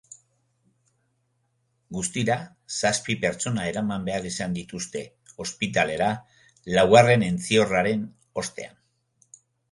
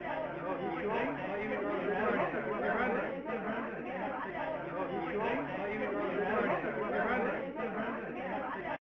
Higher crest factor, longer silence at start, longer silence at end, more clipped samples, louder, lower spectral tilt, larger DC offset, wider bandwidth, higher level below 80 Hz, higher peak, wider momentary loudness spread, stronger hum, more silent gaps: first, 24 dB vs 16 dB; first, 1.9 s vs 0 s; first, 1.05 s vs 0.2 s; neither; first, -24 LUFS vs -35 LUFS; second, -4.5 dB/octave vs -8 dB/octave; neither; first, 11.5 kHz vs 6.4 kHz; first, -56 dBFS vs -62 dBFS; first, -2 dBFS vs -20 dBFS; first, 17 LU vs 6 LU; neither; neither